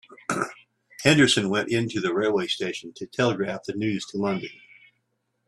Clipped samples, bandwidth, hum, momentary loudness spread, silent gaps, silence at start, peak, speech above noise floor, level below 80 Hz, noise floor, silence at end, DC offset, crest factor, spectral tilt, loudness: under 0.1%; 13 kHz; none; 13 LU; none; 0.1 s; -2 dBFS; 51 dB; -62 dBFS; -75 dBFS; 0.95 s; under 0.1%; 24 dB; -4.5 dB/octave; -24 LUFS